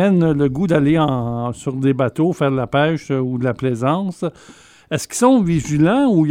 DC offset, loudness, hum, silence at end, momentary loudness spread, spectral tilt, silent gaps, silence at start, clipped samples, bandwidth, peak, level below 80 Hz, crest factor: under 0.1%; -18 LUFS; none; 0 s; 9 LU; -6.5 dB/octave; none; 0 s; under 0.1%; 16 kHz; 0 dBFS; -46 dBFS; 16 dB